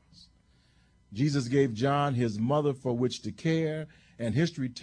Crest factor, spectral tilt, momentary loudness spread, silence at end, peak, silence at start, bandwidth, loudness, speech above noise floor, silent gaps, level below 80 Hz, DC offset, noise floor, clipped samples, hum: 18 dB; -6.5 dB/octave; 8 LU; 0 s; -12 dBFS; 1.1 s; 10.5 kHz; -29 LUFS; 36 dB; none; -62 dBFS; under 0.1%; -64 dBFS; under 0.1%; none